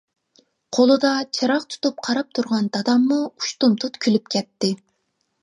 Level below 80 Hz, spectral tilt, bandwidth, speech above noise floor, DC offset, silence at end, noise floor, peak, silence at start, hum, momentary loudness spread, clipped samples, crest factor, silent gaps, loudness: -74 dBFS; -4.5 dB/octave; 11 kHz; 52 dB; under 0.1%; 0.65 s; -72 dBFS; -4 dBFS; 0.7 s; none; 8 LU; under 0.1%; 18 dB; none; -21 LUFS